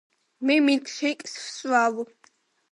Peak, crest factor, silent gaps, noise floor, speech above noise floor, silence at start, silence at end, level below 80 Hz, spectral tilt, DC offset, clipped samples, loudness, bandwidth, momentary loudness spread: -10 dBFS; 16 dB; none; -62 dBFS; 38 dB; 0.4 s; 0.65 s; -82 dBFS; -2.5 dB/octave; under 0.1%; under 0.1%; -24 LUFS; 11 kHz; 14 LU